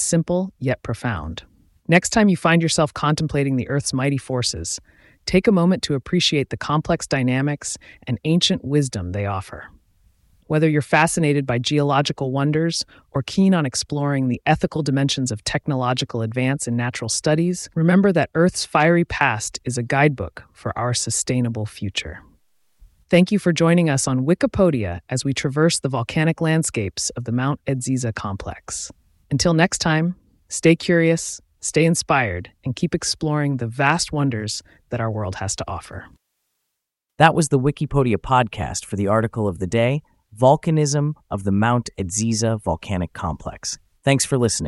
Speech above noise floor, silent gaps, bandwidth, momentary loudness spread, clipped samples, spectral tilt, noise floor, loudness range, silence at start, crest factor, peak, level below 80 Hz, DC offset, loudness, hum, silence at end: 60 dB; none; 12 kHz; 11 LU; under 0.1%; -5 dB/octave; -80 dBFS; 4 LU; 0 s; 20 dB; 0 dBFS; -46 dBFS; under 0.1%; -20 LUFS; none; 0 s